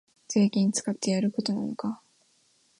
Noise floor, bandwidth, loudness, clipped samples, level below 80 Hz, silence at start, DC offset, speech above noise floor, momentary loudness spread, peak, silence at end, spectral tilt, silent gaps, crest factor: -66 dBFS; 11 kHz; -27 LUFS; under 0.1%; -74 dBFS; 0.3 s; under 0.1%; 40 dB; 11 LU; -12 dBFS; 0.85 s; -5 dB/octave; none; 16 dB